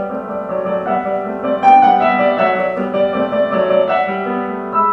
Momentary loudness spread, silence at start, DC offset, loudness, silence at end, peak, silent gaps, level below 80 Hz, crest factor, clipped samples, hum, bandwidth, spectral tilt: 11 LU; 0 s; under 0.1%; -15 LUFS; 0 s; 0 dBFS; none; -54 dBFS; 14 dB; under 0.1%; none; 6 kHz; -7.5 dB/octave